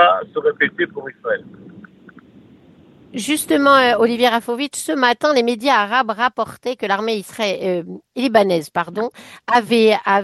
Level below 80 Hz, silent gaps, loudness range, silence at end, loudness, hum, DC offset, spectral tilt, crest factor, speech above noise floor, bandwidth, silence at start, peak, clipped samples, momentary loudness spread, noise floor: -64 dBFS; none; 5 LU; 0 s; -17 LUFS; none; under 0.1%; -3.5 dB/octave; 18 dB; 30 dB; 12.5 kHz; 0 s; 0 dBFS; under 0.1%; 11 LU; -47 dBFS